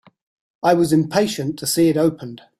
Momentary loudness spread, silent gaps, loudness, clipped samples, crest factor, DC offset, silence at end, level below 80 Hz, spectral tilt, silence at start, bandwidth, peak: 7 LU; none; -18 LUFS; under 0.1%; 16 dB; under 0.1%; 0.25 s; -56 dBFS; -5 dB/octave; 0.65 s; 16 kHz; -2 dBFS